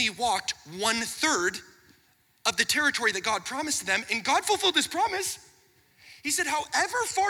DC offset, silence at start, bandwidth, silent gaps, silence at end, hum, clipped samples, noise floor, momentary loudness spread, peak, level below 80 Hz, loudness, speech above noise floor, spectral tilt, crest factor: under 0.1%; 0 s; 20 kHz; none; 0 s; none; under 0.1%; -65 dBFS; 7 LU; -4 dBFS; -64 dBFS; -26 LUFS; 37 dB; -0.5 dB/octave; 24 dB